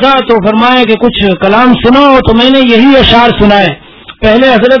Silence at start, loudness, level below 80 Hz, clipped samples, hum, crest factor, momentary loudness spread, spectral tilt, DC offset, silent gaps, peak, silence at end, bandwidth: 0 s; -5 LUFS; -26 dBFS; 10%; none; 6 dB; 5 LU; -7 dB/octave; under 0.1%; none; 0 dBFS; 0 s; 5.4 kHz